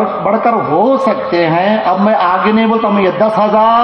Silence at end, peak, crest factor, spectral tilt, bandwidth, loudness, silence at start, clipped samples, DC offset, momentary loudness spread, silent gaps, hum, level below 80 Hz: 0 s; 0 dBFS; 10 dB; -8 dB/octave; 6.4 kHz; -11 LUFS; 0 s; under 0.1%; under 0.1%; 3 LU; none; none; -52 dBFS